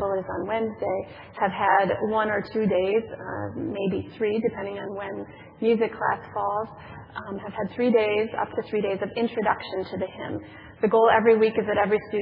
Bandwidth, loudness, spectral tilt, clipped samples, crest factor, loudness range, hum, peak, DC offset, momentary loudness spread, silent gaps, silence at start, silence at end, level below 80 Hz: 5.2 kHz; -25 LUFS; -10 dB/octave; under 0.1%; 18 dB; 4 LU; none; -6 dBFS; under 0.1%; 14 LU; none; 0 s; 0 s; -60 dBFS